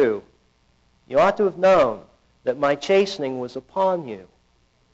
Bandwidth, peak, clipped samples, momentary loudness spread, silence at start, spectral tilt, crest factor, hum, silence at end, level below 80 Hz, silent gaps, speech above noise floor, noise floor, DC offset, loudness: 8 kHz; -10 dBFS; under 0.1%; 14 LU; 0 s; -3.5 dB/octave; 12 dB; none; 0.7 s; -58 dBFS; none; 42 dB; -62 dBFS; under 0.1%; -21 LUFS